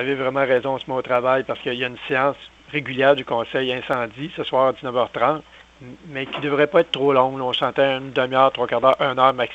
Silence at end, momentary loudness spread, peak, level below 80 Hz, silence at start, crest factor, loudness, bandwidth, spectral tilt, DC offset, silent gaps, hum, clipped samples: 0 s; 9 LU; -2 dBFS; -58 dBFS; 0 s; 20 dB; -20 LUFS; 8 kHz; -6 dB/octave; under 0.1%; none; none; under 0.1%